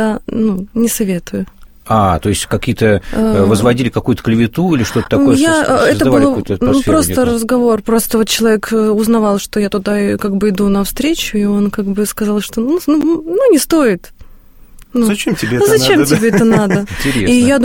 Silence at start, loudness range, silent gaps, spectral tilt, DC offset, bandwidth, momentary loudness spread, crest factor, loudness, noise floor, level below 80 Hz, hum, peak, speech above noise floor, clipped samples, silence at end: 0 s; 3 LU; none; -5 dB/octave; 0.6%; 17 kHz; 6 LU; 12 dB; -13 LUFS; -37 dBFS; -34 dBFS; none; 0 dBFS; 26 dB; under 0.1%; 0 s